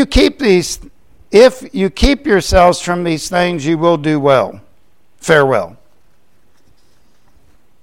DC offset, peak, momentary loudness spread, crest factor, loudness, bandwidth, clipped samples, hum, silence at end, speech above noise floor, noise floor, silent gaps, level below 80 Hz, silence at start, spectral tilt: 0.7%; 0 dBFS; 9 LU; 14 dB; -13 LUFS; 16.5 kHz; under 0.1%; none; 2.1 s; 45 dB; -57 dBFS; none; -26 dBFS; 0 s; -5 dB/octave